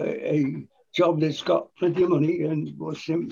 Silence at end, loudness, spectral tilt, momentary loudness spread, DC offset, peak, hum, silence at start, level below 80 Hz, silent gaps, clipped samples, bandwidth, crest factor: 0 s; -25 LUFS; -7.5 dB/octave; 10 LU; under 0.1%; -10 dBFS; none; 0 s; -66 dBFS; none; under 0.1%; 7.2 kHz; 16 dB